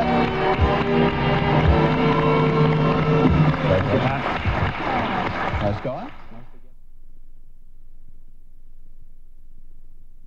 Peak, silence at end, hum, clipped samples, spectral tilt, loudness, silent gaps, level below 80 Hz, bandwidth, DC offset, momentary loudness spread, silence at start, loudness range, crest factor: -6 dBFS; 0 s; none; under 0.1%; -8 dB/octave; -20 LUFS; none; -34 dBFS; 7 kHz; under 0.1%; 6 LU; 0 s; 13 LU; 16 dB